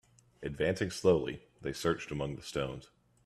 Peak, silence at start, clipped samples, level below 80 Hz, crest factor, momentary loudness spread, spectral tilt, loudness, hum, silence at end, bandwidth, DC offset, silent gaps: -14 dBFS; 0.4 s; under 0.1%; -58 dBFS; 20 dB; 14 LU; -5.5 dB/octave; -34 LUFS; none; 0.4 s; 14 kHz; under 0.1%; none